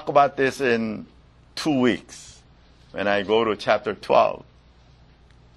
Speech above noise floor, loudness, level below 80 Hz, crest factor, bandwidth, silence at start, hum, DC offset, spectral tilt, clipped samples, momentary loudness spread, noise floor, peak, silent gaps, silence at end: 31 dB; -22 LUFS; -56 dBFS; 22 dB; 12 kHz; 0 s; none; under 0.1%; -5 dB/octave; under 0.1%; 18 LU; -53 dBFS; -2 dBFS; none; 1.2 s